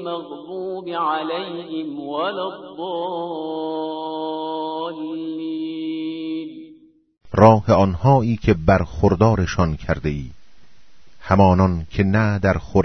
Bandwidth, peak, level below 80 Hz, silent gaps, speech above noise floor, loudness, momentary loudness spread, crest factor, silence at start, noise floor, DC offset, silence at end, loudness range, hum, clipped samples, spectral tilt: 6.4 kHz; 0 dBFS; -38 dBFS; none; 36 dB; -20 LUFS; 14 LU; 20 dB; 0 s; -55 dBFS; under 0.1%; 0 s; 10 LU; none; under 0.1%; -8 dB/octave